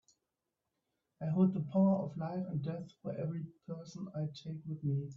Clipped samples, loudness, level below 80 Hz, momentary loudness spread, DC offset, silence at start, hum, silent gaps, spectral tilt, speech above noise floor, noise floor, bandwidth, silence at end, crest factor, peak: under 0.1%; -37 LUFS; -74 dBFS; 14 LU; under 0.1%; 1.2 s; none; none; -9.5 dB/octave; 53 dB; -88 dBFS; 7.2 kHz; 0 s; 18 dB; -20 dBFS